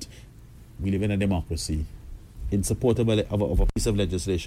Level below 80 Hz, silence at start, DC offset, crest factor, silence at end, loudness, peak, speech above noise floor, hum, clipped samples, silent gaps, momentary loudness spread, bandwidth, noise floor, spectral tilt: -32 dBFS; 0 s; under 0.1%; 16 dB; 0 s; -26 LUFS; -10 dBFS; 23 dB; none; under 0.1%; none; 15 LU; 16 kHz; -47 dBFS; -6 dB/octave